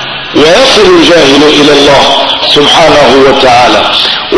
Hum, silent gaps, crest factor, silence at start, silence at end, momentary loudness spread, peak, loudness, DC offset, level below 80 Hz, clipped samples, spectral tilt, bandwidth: none; none; 4 dB; 0 s; 0 s; 3 LU; 0 dBFS; -3 LUFS; under 0.1%; -30 dBFS; 20%; -3 dB/octave; 11 kHz